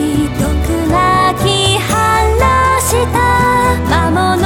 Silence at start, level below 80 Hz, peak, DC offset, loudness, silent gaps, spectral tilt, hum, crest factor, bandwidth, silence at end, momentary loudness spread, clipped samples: 0 s; -22 dBFS; -2 dBFS; under 0.1%; -12 LUFS; none; -4.5 dB/octave; none; 10 dB; 17.5 kHz; 0 s; 4 LU; under 0.1%